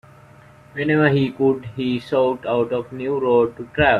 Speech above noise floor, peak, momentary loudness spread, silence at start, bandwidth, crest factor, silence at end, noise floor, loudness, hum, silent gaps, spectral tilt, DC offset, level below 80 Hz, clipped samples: 28 dB; -2 dBFS; 8 LU; 0.75 s; 10 kHz; 18 dB; 0 s; -47 dBFS; -20 LUFS; none; none; -8 dB/octave; under 0.1%; -48 dBFS; under 0.1%